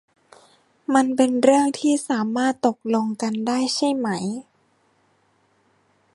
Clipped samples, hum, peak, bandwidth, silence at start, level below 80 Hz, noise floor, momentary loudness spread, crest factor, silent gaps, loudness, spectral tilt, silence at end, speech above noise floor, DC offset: under 0.1%; none; -2 dBFS; 11.5 kHz; 0.9 s; -72 dBFS; -63 dBFS; 9 LU; 20 dB; none; -21 LUFS; -4.5 dB/octave; 1.75 s; 43 dB; under 0.1%